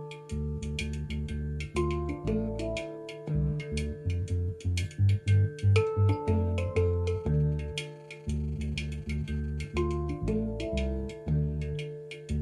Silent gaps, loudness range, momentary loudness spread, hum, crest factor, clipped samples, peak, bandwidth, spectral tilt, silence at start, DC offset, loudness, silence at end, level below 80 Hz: none; 5 LU; 10 LU; none; 18 dB; under 0.1%; -12 dBFS; 11 kHz; -7 dB/octave; 0 s; under 0.1%; -31 LUFS; 0 s; -38 dBFS